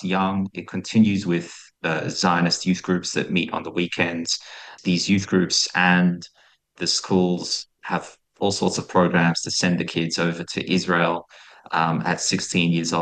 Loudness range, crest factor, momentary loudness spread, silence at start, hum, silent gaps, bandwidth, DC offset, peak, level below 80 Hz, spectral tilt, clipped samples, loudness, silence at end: 2 LU; 18 dB; 9 LU; 0 s; none; none; 9.8 kHz; under 0.1%; -4 dBFS; -62 dBFS; -4.5 dB/octave; under 0.1%; -22 LUFS; 0 s